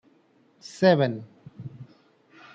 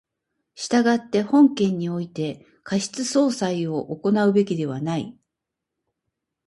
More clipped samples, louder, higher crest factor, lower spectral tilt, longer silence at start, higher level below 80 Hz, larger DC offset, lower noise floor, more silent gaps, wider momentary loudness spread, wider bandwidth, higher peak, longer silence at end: neither; about the same, -22 LUFS vs -22 LUFS; about the same, 22 dB vs 18 dB; about the same, -6.5 dB/octave vs -5.5 dB/octave; first, 0.75 s vs 0.55 s; second, -72 dBFS vs -66 dBFS; neither; second, -62 dBFS vs -84 dBFS; neither; first, 26 LU vs 12 LU; second, 8.8 kHz vs 11.5 kHz; about the same, -6 dBFS vs -6 dBFS; second, 0.7 s vs 1.35 s